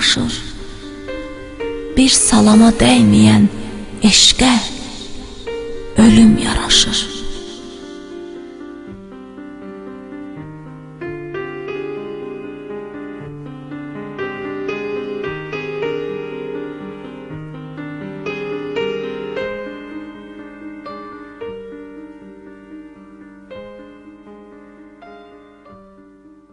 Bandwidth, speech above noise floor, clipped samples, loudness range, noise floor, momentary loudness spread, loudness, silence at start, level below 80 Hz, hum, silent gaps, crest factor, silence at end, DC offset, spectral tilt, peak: 11 kHz; 34 dB; under 0.1%; 22 LU; -45 dBFS; 25 LU; -15 LUFS; 0 s; -36 dBFS; none; none; 18 dB; 0.25 s; under 0.1%; -3.5 dB/octave; 0 dBFS